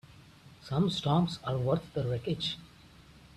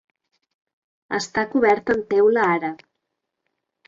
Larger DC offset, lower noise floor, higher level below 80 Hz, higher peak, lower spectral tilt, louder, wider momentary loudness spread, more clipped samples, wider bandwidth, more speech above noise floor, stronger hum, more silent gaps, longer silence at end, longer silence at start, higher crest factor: neither; second, -56 dBFS vs -80 dBFS; about the same, -58 dBFS vs -60 dBFS; second, -14 dBFS vs -6 dBFS; first, -7 dB/octave vs -5 dB/octave; second, -31 LUFS vs -20 LUFS; second, 7 LU vs 10 LU; neither; first, 12 kHz vs 7.6 kHz; second, 25 dB vs 60 dB; neither; neither; second, 0.35 s vs 1.15 s; second, 0.2 s vs 1.1 s; about the same, 18 dB vs 18 dB